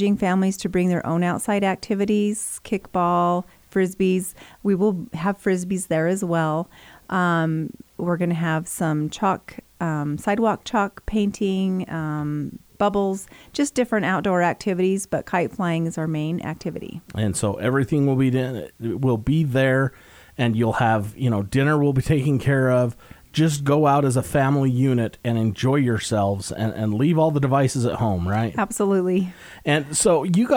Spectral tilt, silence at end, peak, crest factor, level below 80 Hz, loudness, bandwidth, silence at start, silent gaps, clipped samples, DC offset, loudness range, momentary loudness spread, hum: -6 dB/octave; 0 s; -6 dBFS; 16 dB; -48 dBFS; -22 LUFS; over 20 kHz; 0 s; none; under 0.1%; under 0.1%; 4 LU; 8 LU; none